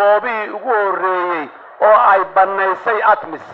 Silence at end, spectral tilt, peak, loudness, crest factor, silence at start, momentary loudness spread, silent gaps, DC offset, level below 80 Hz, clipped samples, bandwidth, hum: 0 s; -6 dB/octave; 0 dBFS; -15 LUFS; 14 dB; 0 s; 10 LU; none; under 0.1%; -66 dBFS; under 0.1%; 5.6 kHz; none